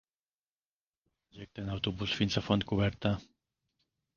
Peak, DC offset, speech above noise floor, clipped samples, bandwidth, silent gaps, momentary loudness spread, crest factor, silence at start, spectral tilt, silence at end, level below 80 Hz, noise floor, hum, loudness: -12 dBFS; under 0.1%; over 58 dB; under 0.1%; 7.2 kHz; none; 13 LU; 24 dB; 1.35 s; -6 dB/octave; 0.9 s; -54 dBFS; under -90 dBFS; none; -33 LUFS